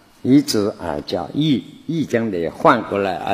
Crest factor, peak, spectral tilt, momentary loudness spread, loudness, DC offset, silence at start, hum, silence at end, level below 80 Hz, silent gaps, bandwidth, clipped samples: 18 dB; 0 dBFS; -5.5 dB/octave; 9 LU; -19 LUFS; under 0.1%; 0.25 s; none; 0 s; -52 dBFS; none; 15 kHz; under 0.1%